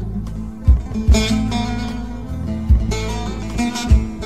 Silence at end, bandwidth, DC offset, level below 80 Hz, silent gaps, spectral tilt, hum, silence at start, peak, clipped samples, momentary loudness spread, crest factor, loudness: 0 s; 13 kHz; 1%; -20 dBFS; none; -6 dB/octave; none; 0 s; -4 dBFS; under 0.1%; 11 LU; 14 dB; -20 LUFS